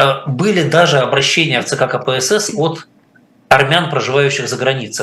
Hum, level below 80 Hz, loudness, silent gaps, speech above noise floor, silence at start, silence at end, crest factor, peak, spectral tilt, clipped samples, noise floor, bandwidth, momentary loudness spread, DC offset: none; -54 dBFS; -13 LUFS; none; 36 dB; 0 s; 0 s; 14 dB; 0 dBFS; -4 dB/octave; 0.1%; -50 dBFS; 13 kHz; 6 LU; under 0.1%